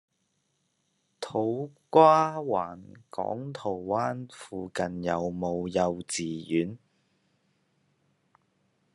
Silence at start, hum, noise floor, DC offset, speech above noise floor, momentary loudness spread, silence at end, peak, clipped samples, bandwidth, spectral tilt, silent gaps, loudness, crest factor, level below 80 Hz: 1.2 s; none; -76 dBFS; under 0.1%; 48 dB; 19 LU; 2.2 s; -4 dBFS; under 0.1%; 12 kHz; -5.5 dB/octave; none; -28 LUFS; 24 dB; -74 dBFS